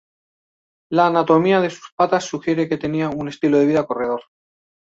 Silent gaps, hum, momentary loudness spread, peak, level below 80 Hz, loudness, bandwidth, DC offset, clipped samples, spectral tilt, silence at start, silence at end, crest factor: 1.92-1.97 s; none; 9 LU; -2 dBFS; -58 dBFS; -19 LUFS; 7.8 kHz; under 0.1%; under 0.1%; -6.5 dB/octave; 0.9 s; 0.75 s; 18 dB